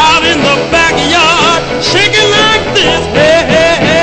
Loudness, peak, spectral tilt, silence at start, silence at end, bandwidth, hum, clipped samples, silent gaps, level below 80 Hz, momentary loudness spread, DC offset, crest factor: -7 LUFS; 0 dBFS; -3 dB/octave; 0 s; 0 s; 11 kHz; none; 0.5%; none; -32 dBFS; 3 LU; under 0.1%; 8 dB